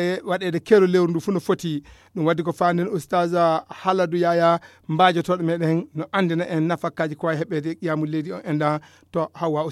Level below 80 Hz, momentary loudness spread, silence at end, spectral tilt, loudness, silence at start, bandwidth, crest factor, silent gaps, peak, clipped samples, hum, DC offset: -64 dBFS; 9 LU; 0 s; -7 dB/octave; -22 LUFS; 0 s; 13.5 kHz; 18 dB; none; -2 dBFS; under 0.1%; none; under 0.1%